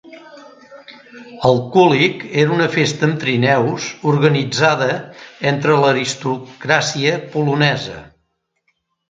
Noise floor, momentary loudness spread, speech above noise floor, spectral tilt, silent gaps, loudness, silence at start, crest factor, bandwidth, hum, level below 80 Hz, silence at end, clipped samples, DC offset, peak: -69 dBFS; 10 LU; 53 dB; -5 dB/octave; none; -16 LUFS; 0.05 s; 18 dB; 9.2 kHz; none; -56 dBFS; 1.05 s; under 0.1%; under 0.1%; 0 dBFS